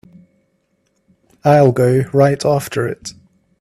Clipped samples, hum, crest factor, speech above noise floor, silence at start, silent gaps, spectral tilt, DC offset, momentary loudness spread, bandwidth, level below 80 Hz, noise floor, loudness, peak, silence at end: under 0.1%; none; 16 dB; 51 dB; 1.45 s; none; -7 dB/octave; under 0.1%; 13 LU; 14.5 kHz; -52 dBFS; -64 dBFS; -14 LUFS; 0 dBFS; 0.5 s